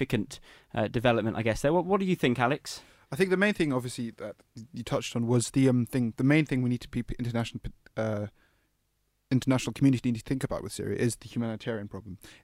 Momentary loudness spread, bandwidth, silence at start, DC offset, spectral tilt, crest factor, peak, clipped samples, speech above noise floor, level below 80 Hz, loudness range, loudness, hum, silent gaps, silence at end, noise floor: 16 LU; 16 kHz; 0 s; under 0.1%; -6 dB/octave; 18 dB; -10 dBFS; under 0.1%; 46 dB; -52 dBFS; 3 LU; -29 LUFS; none; none; 0.1 s; -75 dBFS